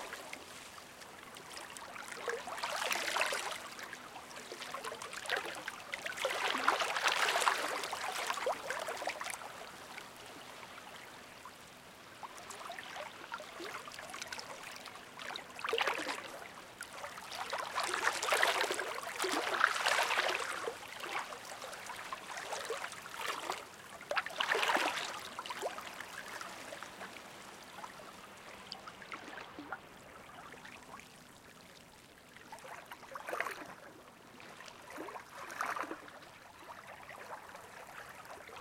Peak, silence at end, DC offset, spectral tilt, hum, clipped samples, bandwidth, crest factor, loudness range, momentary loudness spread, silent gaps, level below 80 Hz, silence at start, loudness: -10 dBFS; 0 s; under 0.1%; -0.5 dB/octave; none; under 0.1%; 17 kHz; 30 dB; 15 LU; 19 LU; none; -76 dBFS; 0 s; -38 LUFS